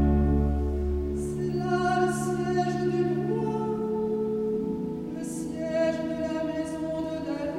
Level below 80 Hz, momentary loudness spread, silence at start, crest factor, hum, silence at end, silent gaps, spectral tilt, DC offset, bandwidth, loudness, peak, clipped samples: -36 dBFS; 7 LU; 0 s; 16 dB; none; 0 s; none; -7 dB/octave; under 0.1%; 13.5 kHz; -28 LUFS; -12 dBFS; under 0.1%